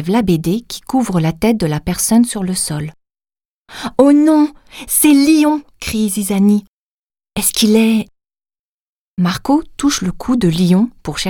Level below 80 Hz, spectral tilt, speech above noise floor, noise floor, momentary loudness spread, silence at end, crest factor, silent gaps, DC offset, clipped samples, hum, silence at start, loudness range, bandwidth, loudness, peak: -40 dBFS; -5 dB/octave; over 76 dB; under -90 dBFS; 11 LU; 0 s; 14 dB; 3.45-3.65 s, 6.68-7.10 s, 8.59-9.17 s; under 0.1%; under 0.1%; none; 0 s; 4 LU; 19 kHz; -14 LUFS; 0 dBFS